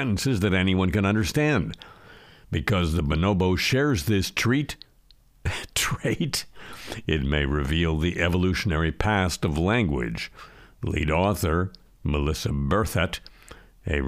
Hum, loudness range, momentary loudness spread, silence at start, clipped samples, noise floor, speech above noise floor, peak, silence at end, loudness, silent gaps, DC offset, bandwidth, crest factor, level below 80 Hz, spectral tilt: none; 3 LU; 12 LU; 0 s; under 0.1%; -57 dBFS; 33 dB; -4 dBFS; 0 s; -25 LUFS; none; under 0.1%; 15.5 kHz; 20 dB; -36 dBFS; -5.5 dB/octave